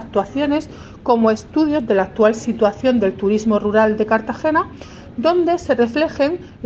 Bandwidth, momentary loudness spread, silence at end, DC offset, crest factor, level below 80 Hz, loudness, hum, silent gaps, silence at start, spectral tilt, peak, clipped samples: 8 kHz; 5 LU; 0 s; under 0.1%; 16 dB; -46 dBFS; -18 LUFS; none; none; 0 s; -6 dB/octave; -2 dBFS; under 0.1%